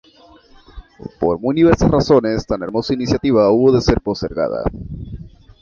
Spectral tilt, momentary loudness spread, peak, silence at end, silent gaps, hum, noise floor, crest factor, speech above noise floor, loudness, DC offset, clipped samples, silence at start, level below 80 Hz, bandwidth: -7 dB/octave; 19 LU; 0 dBFS; 0.35 s; none; none; -47 dBFS; 16 dB; 31 dB; -16 LUFS; under 0.1%; under 0.1%; 0.75 s; -34 dBFS; 7.2 kHz